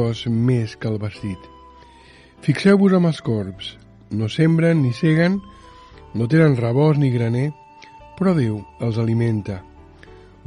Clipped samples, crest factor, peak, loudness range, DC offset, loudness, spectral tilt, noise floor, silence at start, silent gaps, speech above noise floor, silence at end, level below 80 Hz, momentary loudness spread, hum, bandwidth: under 0.1%; 16 dB; -4 dBFS; 3 LU; under 0.1%; -19 LUFS; -8 dB/octave; -47 dBFS; 0 s; none; 29 dB; 0.3 s; -50 dBFS; 15 LU; none; 10.5 kHz